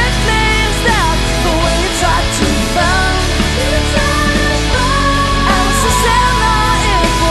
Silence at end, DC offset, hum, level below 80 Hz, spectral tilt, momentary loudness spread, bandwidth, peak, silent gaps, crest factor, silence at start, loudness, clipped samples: 0 s; under 0.1%; none; -18 dBFS; -4 dB/octave; 2 LU; 13 kHz; 0 dBFS; none; 12 dB; 0 s; -12 LUFS; under 0.1%